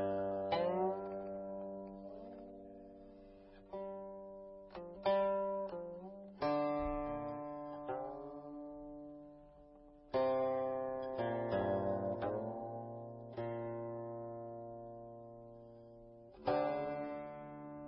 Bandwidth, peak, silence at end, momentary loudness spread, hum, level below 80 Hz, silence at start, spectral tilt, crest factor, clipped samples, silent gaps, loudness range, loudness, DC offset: 5.4 kHz; -22 dBFS; 0 s; 20 LU; none; -64 dBFS; 0 s; -5.5 dB/octave; 20 dB; under 0.1%; none; 9 LU; -41 LUFS; under 0.1%